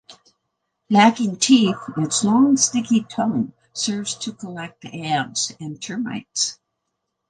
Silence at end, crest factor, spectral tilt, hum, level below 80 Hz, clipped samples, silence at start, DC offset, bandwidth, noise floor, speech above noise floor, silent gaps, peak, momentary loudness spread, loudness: 0.75 s; 20 dB; -3.5 dB/octave; none; -64 dBFS; under 0.1%; 0.1 s; under 0.1%; 10 kHz; -77 dBFS; 57 dB; none; -2 dBFS; 15 LU; -20 LUFS